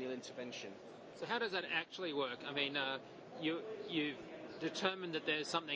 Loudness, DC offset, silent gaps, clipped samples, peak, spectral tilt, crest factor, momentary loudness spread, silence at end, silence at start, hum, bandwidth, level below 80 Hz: -40 LUFS; under 0.1%; none; under 0.1%; -18 dBFS; -3.5 dB/octave; 24 dB; 12 LU; 0 s; 0 s; none; 8 kHz; -84 dBFS